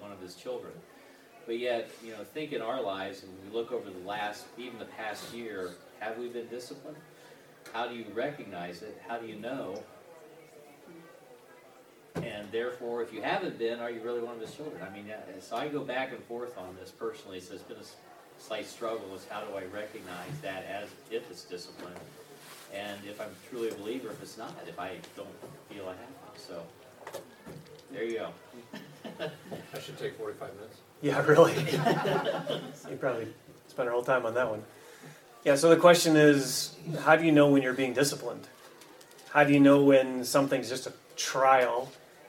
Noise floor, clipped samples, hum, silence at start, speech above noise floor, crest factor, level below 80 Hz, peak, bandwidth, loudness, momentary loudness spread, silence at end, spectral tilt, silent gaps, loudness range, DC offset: -56 dBFS; under 0.1%; none; 0 s; 26 dB; 24 dB; -76 dBFS; -6 dBFS; 17 kHz; -29 LUFS; 24 LU; 0 s; -5 dB/octave; none; 17 LU; under 0.1%